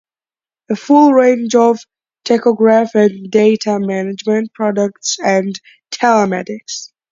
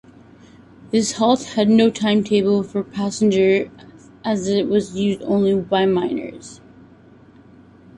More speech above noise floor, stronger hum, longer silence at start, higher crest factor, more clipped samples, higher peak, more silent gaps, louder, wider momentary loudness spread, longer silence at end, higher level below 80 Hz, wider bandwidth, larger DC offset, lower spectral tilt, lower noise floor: first, over 77 dB vs 29 dB; neither; second, 0.7 s vs 0.95 s; about the same, 14 dB vs 18 dB; neither; about the same, 0 dBFS vs -2 dBFS; neither; first, -13 LUFS vs -19 LUFS; first, 14 LU vs 11 LU; second, 0.25 s vs 1.45 s; second, -64 dBFS vs -56 dBFS; second, 7.6 kHz vs 11 kHz; neither; about the same, -5 dB/octave vs -5.5 dB/octave; first, under -90 dBFS vs -47 dBFS